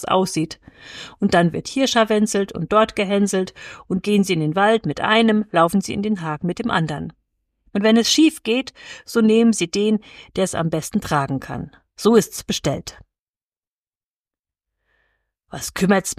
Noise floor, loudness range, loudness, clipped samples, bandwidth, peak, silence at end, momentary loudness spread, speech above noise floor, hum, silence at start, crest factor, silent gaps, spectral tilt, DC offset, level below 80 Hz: under -90 dBFS; 6 LU; -19 LUFS; under 0.1%; 15.5 kHz; -2 dBFS; 0.05 s; 15 LU; over 71 dB; none; 0 s; 18 dB; 13.19-13.51 s, 13.57-13.61 s, 13.67-13.91 s, 13.97-14.25 s; -4.5 dB/octave; under 0.1%; -52 dBFS